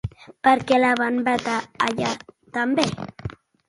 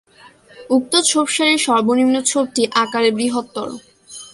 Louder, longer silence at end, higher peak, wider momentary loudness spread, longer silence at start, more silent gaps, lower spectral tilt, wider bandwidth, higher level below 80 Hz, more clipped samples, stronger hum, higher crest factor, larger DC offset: second, -22 LUFS vs -16 LUFS; first, 0.35 s vs 0.05 s; about the same, -2 dBFS vs -2 dBFS; about the same, 16 LU vs 15 LU; second, 0.05 s vs 0.25 s; neither; first, -4.5 dB/octave vs -2 dB/octave; about the same, 11.5 kHz vs 11.5 kHz; first, -50 dBFS vs -62 dBFS; neither; neither; about the same, 20 dB vs 16 dB; neither